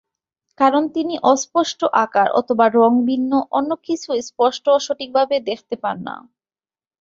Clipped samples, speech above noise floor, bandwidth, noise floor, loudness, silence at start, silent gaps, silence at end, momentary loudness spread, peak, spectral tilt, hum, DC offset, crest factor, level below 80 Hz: under 0.1%; over 72 dB; 7.8 kHz; under -90 dBFS; -18 LUFS; 0.6 s; none; 0.8 s; 10 LU; -2 dBFS; -4 dB/octave; none; under 0.1%; 16 dB; -64 dBFS